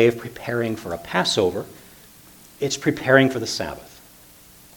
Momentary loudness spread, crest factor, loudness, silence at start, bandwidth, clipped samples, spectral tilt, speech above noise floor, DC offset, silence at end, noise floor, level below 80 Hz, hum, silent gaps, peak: 15 LU; 24 dB; -22 LUFS; 0 s; 19 kHz; under 0.1%; -4.5 dB/octave; 27 dB; under 0.1%; 0.9 s; -48 dBFS; -54 dBFS; none; none; 0 dBFS